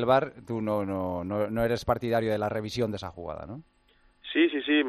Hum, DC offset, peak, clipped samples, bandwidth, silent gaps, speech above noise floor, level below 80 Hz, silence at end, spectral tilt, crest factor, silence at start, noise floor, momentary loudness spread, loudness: none; under 0.1%; -10 dBFS; under 0.1%; 13.5 kHz; none; 36 dB; -54 dBFS; 0 s; -6.5 dB/octave; 18 dB; 0 s; -63 dBFS; 14 LU; -29 LUFS